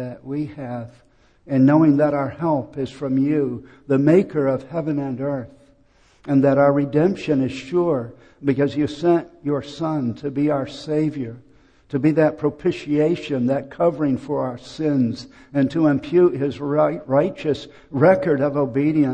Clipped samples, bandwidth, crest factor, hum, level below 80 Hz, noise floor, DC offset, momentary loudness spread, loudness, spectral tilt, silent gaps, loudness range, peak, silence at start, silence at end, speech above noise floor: under 0.1%; 8.6 kHz; 18 dB; none; -54 dBFS; -56 dBFS; under 0.1%; 12 LU; -20 LUFS; -8.5 dB/octave; none; 3 LU; -4 dBFS; 0 s; 0 s; 36 dB